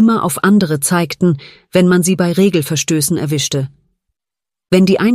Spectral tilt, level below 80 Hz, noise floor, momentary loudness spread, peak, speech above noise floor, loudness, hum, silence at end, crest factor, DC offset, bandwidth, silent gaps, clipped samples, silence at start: -5 dB/octave; -52 dBFS; -88 dBFS; 6 LU; 0 dBFS; 75 dB; -14 LUFS; none; 0 s; 12 dB; under 0.1%; 15.5 kHz; none; under 0.1%; 0 s